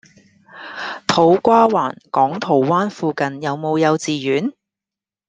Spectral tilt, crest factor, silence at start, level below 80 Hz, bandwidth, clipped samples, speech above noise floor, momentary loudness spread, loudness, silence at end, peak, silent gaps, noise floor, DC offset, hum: -5.5 dB/octave; 18 dB; 0.55 s; -62 dBFS; 9.6 kHz; under 0.1%; 72 dB; 14 LU; -17 LUFS; 0.75 s; 0 dBFS; none; -89 dBFS; under 0.1%; none